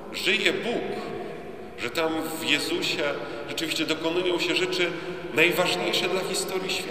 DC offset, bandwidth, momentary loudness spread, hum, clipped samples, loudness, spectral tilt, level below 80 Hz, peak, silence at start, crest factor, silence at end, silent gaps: 0.5%; 15.5 kHz; 11 LU; none; under 0.1%; -25 LUFS; -3 dB/octave; -60 dBFS; -4 dBFS; 0 s; 22 dB; 0 s; none